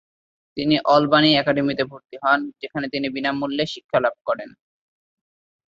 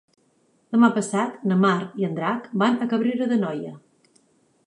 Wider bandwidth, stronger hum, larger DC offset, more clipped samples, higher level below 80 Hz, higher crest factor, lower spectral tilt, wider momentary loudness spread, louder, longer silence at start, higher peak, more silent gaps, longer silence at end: second, 7.6 kHz vs 11 kHz; neither; neither; neither; first, -62 dBFS vs -74 dBFS; about the same, 20 dB vs 18 dB; about the same, -6 dB/octave vs -6.5 dB/octave; first, 13 LU vs 8 LU; about the same, -21 LUFS vs -22 LUFS; second, 0.55 s vs 0.7 s; first, -2 dBFS vs -6 dBFS; first, 3.84-3.89 s, 4.21-4.25 s vs none; first, 1.25 s vs 0.9 s